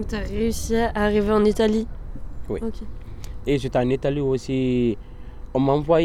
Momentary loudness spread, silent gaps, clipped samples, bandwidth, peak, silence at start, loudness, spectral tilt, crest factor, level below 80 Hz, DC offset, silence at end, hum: 20 LU; none; under 0.1%; 15.5 kHz; -6 dBFS; 0 s; -23 LUFS; -6.5 dB/octave; 16 dB; -34 dBFS; under 0.1%; 0 s; none